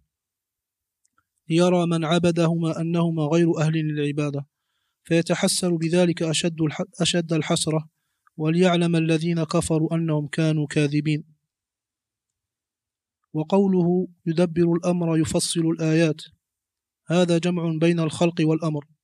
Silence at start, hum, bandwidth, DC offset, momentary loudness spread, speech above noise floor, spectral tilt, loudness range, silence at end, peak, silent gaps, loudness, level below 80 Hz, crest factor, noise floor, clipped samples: 1.5 s; none; 13 kHz; under 0.1%; 6 LU; 67 dB; -5.5 dB/octave; 4 LU; 0.2 s; -6 dBFS; none; -22 LUFS; -60 dBFS; 18 dB; -89 dBFS; under 0.1%